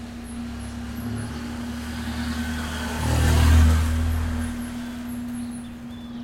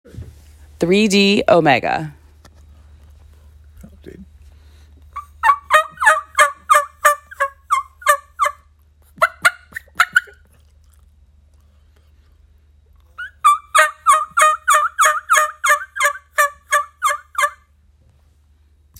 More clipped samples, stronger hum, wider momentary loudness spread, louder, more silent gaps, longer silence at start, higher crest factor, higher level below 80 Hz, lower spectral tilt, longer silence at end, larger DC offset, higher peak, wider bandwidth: neither; neither; first, 16 LU vs 11 LU; second, -25 LUFS vs -16 LUFS; neither; second, 0 s vs 0.15 s; about the same, 16 dB vs 18 dB; first, -30 dBFS vs -50 dBFS; first, -5.5 dB/octave vs -3 dB/octave; second, 0 s vs 1.5 s; neither; second, -8 dBFS vs 0 dBFS; about the same, 16 kHz vs 17 kHz